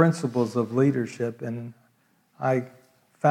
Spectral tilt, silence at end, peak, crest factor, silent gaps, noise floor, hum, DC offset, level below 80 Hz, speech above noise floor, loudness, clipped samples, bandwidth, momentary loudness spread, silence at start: -7.5 dB/octave; 0 s; -4 dBFS; 20 dB; none; -65 dBFS; none; under 0.1%; -76 dBFS; 41 dB; -26 LUFS; under 0.1%; 13 kHz; 13 LU; 0 s